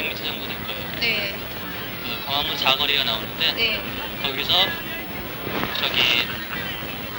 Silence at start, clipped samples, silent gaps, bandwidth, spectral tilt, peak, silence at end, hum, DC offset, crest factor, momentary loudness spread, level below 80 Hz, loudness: 0 s; under 0.1%; none; over 20 kHz; -3 dB/octave; -6 dBFS; 0 s; none; under 0.1%; 20 dB; 11 LU; -46 dBFS; -22 LUFS